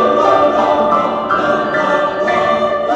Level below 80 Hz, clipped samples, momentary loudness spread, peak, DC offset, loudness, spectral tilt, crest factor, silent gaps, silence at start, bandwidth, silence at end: -48 dBFS; under 0.1%; 4 LU; 0 dBFS; under 0.1%; -13 LUFS; -5.5 dB/octave; 14 dB; none; 0 s; 8.2 kHz; 0 s